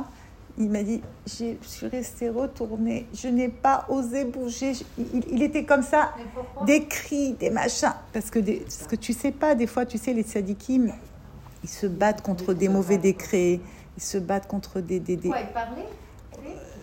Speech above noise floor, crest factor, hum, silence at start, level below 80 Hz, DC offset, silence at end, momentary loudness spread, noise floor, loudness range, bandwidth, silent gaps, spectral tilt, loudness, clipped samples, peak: 21 dB; 20 dB; none; 0 s; -48 dBFS; under 0.1%; 0 s; 16 LU; -46 dBFS; 4 LU; 16.5 kHz; none; -5 dB/octave; -26 LUFS; under 0.1%; -6 dBFS